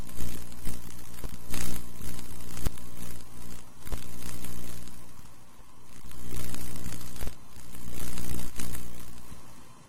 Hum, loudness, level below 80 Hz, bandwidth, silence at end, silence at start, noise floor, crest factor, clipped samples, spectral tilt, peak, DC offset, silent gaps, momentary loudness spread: none; -41 LUFS; -44 dBFS; 16.5 kHz; 0 s; 0 s; -50 dBFS; 12 dB; under 0.1%; -4 dB/octave; -10 dBFS; 8%; none; 12 LU